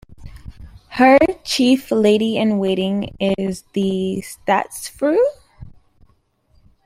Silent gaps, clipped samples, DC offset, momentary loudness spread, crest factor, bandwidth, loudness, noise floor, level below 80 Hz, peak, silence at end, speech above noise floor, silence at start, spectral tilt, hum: none; under 0.1%; under 0.1%; 10 LU; 18 dB; 16 kHz; -18 LUFS; -59 dBFS; -46 dBFS; -2 dBFS; 1.15 s; 43 dB; 0.1 s; -5.5 dB/octave; none